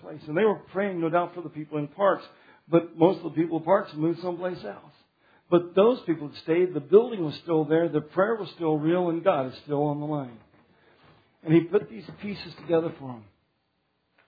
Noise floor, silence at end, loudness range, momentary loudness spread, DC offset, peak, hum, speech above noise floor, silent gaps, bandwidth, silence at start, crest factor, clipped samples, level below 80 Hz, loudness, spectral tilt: -74 dBFS; 1.05 s; 5 LU; 15 LU; under 0.1%; -4 dBFS; none; 48 dB; none; 5 kHz; 0 s; 22 dB; under 0.1%; -72 dBFS; -26 LUFS; -10 dB/octave